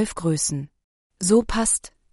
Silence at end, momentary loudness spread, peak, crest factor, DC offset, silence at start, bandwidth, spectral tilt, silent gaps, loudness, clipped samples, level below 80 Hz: 0.25 s; 11 LU; -6 dBFS; 18 dB; under 0.1%; 0 s; 11.5 kHz; -4 dB/octave; 0.84-1.10 s; -22 LUFS; under 0.1%; -42 dBFS